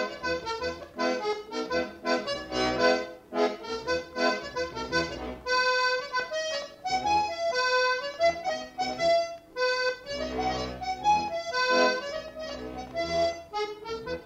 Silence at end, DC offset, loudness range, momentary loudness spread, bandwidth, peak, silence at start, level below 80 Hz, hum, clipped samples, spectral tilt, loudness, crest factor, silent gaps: 0 s; under 0.1%; 2 LU; 10 LU; 15.5 kHz; -12 dBFS; 0 s; -54 dBFS; none; under 0.1%; -3 dB/octave; -29 LUFS; 18 dB; none